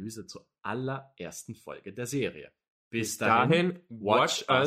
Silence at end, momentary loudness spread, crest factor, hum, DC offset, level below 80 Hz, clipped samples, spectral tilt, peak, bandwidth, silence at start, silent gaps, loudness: 0 s; 18 LU; 20 dB; none; under 0.1%; -68 dBFS; under 0.1%; -4.5 dB/octave; -8 dBFS; 16 kHz; 0 s; 2.70-2.91 s; -28 LUFS